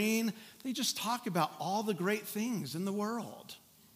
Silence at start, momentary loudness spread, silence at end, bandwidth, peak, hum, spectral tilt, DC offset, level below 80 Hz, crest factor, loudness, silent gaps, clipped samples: 0 s; 12 LU; 0.4 s; 16 kHz; -16 dBFS; none; -4 dB/octave; under 0.1%; -84 dBFS; 18 dB; -35 LUFS; none; under 0.1%